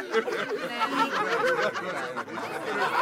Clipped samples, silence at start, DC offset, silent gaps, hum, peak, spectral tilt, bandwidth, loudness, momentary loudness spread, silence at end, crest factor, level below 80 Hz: under 0.1%; 0 s; under 0.1%; none; none; -12 dBFS; -3.5 dB/octave; 16.5 kHz; -28 LUFS; 8 LU; 0 s; 16 dB; -76 dBFS